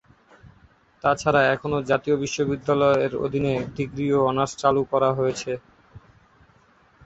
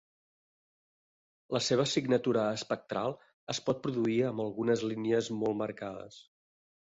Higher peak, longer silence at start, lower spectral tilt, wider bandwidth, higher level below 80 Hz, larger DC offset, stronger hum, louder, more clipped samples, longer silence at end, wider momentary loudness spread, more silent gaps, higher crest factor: first, -4 dBFS vs -14 dBFS; second, 1.05 s vs 1.5 s; about the same, -5.5 dB/octave vs -5 dB/octave; about the same, 8.2 kHz vs 8.2 kHz; first, -54 dBFS vs -72 dBFS; neither; neither; first, -23 LUFS vs -32 LUFS; neither; first, 1.05 s vs 0.6 s; second, 7 LU vs 10 LU; second, none vs 3.33-3.47 s; about the same, 20 dB vs 18 dB